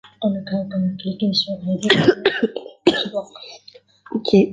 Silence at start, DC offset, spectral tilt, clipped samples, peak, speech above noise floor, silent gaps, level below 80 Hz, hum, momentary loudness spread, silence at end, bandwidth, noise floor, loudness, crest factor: 0.2 s; under 0.1%; -6 dB/octave; under 0.1%; 0 dBFS; 29 dB; none; -58 dBFS; none; 14 LU; 0 s; 9.4 kHz; -48 dBFS; -20 LUFS; 20 dB